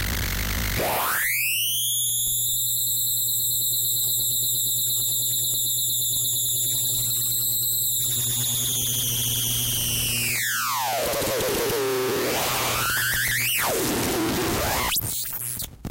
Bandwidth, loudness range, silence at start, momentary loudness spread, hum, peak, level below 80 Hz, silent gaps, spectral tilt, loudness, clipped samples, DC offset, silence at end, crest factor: 16 kHz; 2 LU; 0 s; 4 LU; none; -14 dBFS; -42 dBFS; none; -1.5 dB/octave; -22 LUFS; under 0.1%; under 0.1%; 0 s; 10 dB